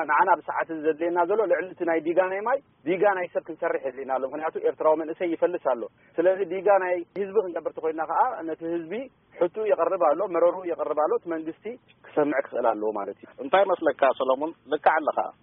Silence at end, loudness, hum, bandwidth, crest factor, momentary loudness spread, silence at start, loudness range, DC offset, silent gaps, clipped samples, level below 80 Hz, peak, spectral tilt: 0.1 s; -25 LUFS; none; 3.8 kHz; 20 dB; 9 LU; 0 s; 2 LU; under 0.1%; none; under 0.1%; -76 dBFS; -6 dBFS; 1 dB/octave